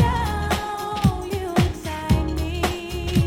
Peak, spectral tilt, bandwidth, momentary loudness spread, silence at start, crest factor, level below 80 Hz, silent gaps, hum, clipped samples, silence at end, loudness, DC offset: -4 dBFS; -6 dB/octave; 17.5 kHz; 6 LU; 0 s; 18 dB; -30 dBFS; none; none; under 0.1%; 0 s; -24 LUFS; under 0.1%